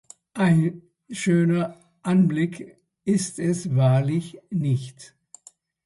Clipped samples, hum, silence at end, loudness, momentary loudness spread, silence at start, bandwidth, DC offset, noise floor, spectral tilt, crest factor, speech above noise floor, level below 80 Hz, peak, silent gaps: under 0.1%; none; 0.8 s; -23 LUFS; 13 LU; 0.35 s; 11.5 kHz; under 0.1%; -54 dBFS; -7 dB/octave; 14 dB; 33 dB; -62 dBFS; -8 dBFS; none